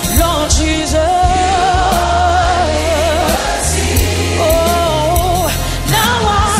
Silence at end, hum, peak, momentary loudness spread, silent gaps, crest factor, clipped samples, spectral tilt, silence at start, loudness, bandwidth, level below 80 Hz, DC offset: 0 s; none; 0 dBFS; 2 LU; none; 12 dB; under 0.1%; -4 dB/octave; 0 s; -13 LUFS; 16 kHz; -20 dBFS; under 0.1%